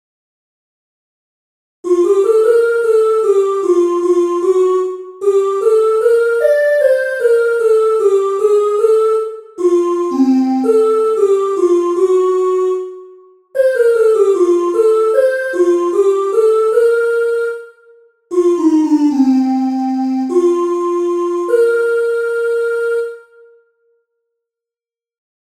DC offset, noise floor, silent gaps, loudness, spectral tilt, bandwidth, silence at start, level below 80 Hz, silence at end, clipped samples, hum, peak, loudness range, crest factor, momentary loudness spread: under 0.1%; under -90 dBFS; none; -13 LUFS; -4 dB/octave; 13 kHz; 1.85 s; -66 dBFS; 2.4 s; under 0.1%; none; 0 dBFS; 3 LU; 12 dB; 5 LU